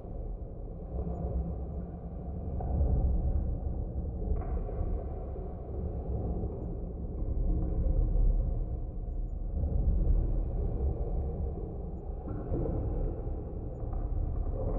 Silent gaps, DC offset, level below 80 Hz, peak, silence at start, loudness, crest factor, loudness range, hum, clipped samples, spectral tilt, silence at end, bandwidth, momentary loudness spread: none; under 0.1%; -32 dBFS; -18 dBFS; 0 s; -36 LUFS; 14 dB; 4 LU; none; under 0.1%; -13.5 dB/octave; 0 s; 1.7 kHz; 9 LU